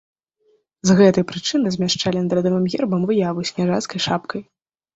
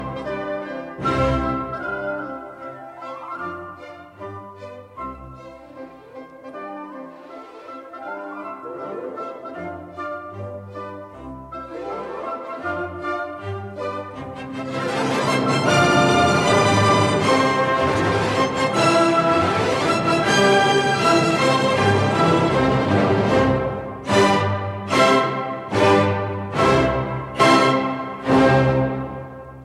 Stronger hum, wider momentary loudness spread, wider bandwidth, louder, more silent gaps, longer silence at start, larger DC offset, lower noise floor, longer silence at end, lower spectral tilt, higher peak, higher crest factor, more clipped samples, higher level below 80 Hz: neither; second, 9 LU vs 21 LU; second, 8 kHz vs 13.5 kHz; about the same, -19 LUFS vs -19 LUFS; neither; first, 0.85 s vs 0 s; neither; first, -63 dBFS vs -40 dBFS; first, 0.55 s vs 0 s; about the same, -5.5 dB/octave vs -5 dB/octave; about the same, -2 dBFS vs -2 dBFS; about the same, 18 dB vs 18 dB; neither; second, -56 dBFS vs -44 dBFS